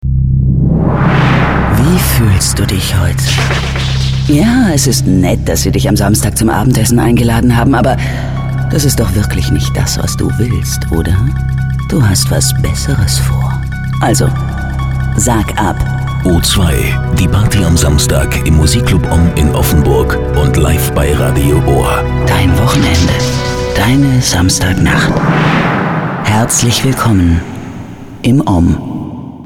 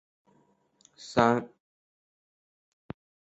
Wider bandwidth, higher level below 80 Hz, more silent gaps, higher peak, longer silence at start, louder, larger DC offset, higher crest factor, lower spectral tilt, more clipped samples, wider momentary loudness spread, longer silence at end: first, 17.5 kHz vs 8.2 kHz; first, -18 dBFS vs -64 dBFS; neither; first, 0 dBFS vs -6 dBFS; second, 0 s vs 1 s; first, -11 LUFS vs -26 LUFS; neither; second, 10 dB vs 28 dB; about the same, -5 dB/octave vs -6 dB/octave; neither; second, 5 LU vs 24 LU; second, 0 s vs 1.8 s